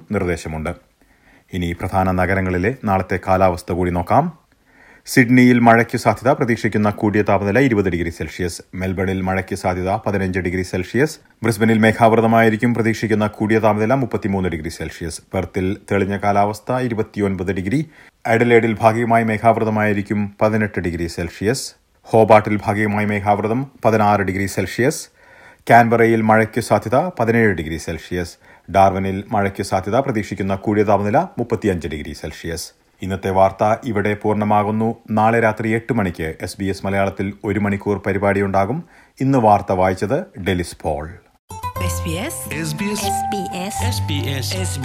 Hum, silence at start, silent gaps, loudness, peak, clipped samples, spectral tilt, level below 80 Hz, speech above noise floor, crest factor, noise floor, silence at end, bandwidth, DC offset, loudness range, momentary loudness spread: none; 0.1 s; 41.39-41.48 s; -18 LUFS; 0 dBFS; under 0.1%; -6 dB/octave; -48 dBFS; 35 dB; 18 dB; -53 dBFS; 0 s; 16.5 kHz; under 0.1%; 5 LU; 12 LU